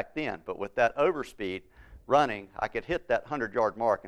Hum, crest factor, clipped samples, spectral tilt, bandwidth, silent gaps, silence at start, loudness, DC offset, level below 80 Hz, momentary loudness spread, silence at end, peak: none; 22 dB; under 0.1%; -5.5 dB/octave; 12.5 kHz; none; 0 s; -29 LUFS; under 0.1%; -56 dBFS; 11 LU; 0 s; -8 dBFS